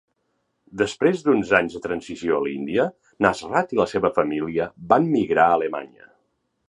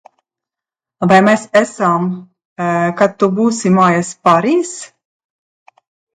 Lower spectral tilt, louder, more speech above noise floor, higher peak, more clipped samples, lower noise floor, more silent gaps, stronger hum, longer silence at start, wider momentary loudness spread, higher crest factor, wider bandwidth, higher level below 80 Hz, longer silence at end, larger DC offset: about the same, -6 dB/octave vs -6 dB/octave; second, -22 LUFS vs -13 LUFS; second, 51 dB vs 74 dB; about the same, -2 dBFS vs 0 dBFS; neither; second, -72 dBFS vs -87 dBFS; second, none vs 2.45-2.56 s; neither; second, 0.75 s vs 1 s; second, 9 LU vs 12 LU; first, 22 dB vs 14 dB; about the same, 11 kHz vs 10 kHz; about the same, -56 dBFS vs -60 dBFS; second, 0.8 s vs 1.3 s; neither